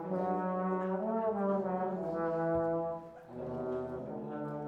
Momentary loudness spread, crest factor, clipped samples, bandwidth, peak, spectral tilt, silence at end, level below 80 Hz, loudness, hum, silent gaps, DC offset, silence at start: 9 LU; 14 dB; under 0.1%; 5.4 kHz; -22 dBFS; -10 dB/octave; 0 s; -64 dBFS; -35 LUFS; none; none; under 0.1%; 0 s